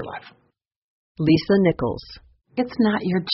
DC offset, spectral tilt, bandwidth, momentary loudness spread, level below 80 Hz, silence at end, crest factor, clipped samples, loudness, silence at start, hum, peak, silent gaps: under 0.1%; -5.5 dB/octave; 6 kHz; 17 LU; -50 dBFS; 0 s; 18 dB; under 0.1%; -21 LUFS; 0 s; none; -6 dBFS; 0.76-1.15 s